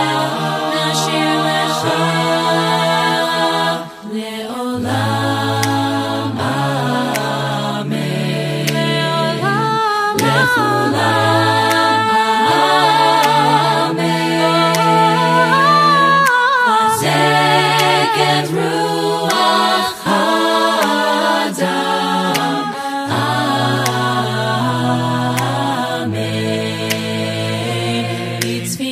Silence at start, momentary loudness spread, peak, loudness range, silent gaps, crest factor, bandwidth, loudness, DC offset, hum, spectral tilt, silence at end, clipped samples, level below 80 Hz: 0 s; 8 LU; 0 dBFS; 6 LU; none; 14 dB; 15.5 kHz; -15 LUFS; under 0.1%; none; -4.5 dB/octave; 0 s; under 0.1%; -58 dBFS